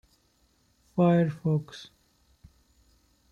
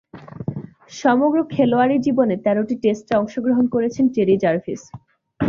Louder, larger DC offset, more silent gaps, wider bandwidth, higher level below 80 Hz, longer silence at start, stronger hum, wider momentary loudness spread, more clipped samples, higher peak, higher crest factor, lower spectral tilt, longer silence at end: second, -26 LUFS vs -19 LUFS; neither; neither; about the same, 7 kHz vs 7.4 kHz; second, -64 dBFS vs -54 dBFS; first, 0.95 s vs 0.15 s; neither; first, 21 LU vs 14 LU; neither; second, -14 dBFS vs -4 dBFS; about the same, 18 dB vs 16 dB; first, -8.5 dB/octave vs -7 dB/octave; first, 1.45 s vs 0 s